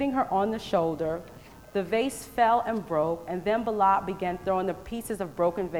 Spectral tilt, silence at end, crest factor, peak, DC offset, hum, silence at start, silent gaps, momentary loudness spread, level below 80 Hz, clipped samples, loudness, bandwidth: -5.5 dB/octave; 0 s; 18 dB; -10 dBFS; 0.1%; none; 0 s; none; 10 LU; -54 dBFS; under 0.1%; -28 LUFS; over 20 kHz